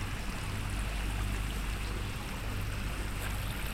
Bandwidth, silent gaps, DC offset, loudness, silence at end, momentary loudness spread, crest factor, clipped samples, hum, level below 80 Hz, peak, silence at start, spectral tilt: 16 kHz; none; 0.1%; -37 LUFS; 0 s; 2 LU; 12 dB; under 0.1%; none; -38 dBFS; -22 dBFS; 0 s; -4.5 dB/octave